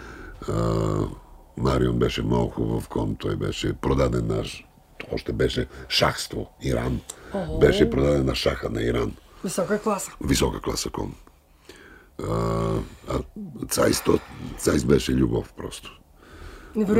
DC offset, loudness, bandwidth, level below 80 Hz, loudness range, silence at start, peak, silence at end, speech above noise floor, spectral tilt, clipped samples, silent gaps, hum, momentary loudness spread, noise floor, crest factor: under 0.1%; -25 LUFS; 16 kHz; -36 dBFS; 4 LU; 0 s; -4 dBFS; 0 s; 27 dB; -5.5 dB/octave; under 0.1%; none; none; 15 LU; -51 dBFS; 20 dB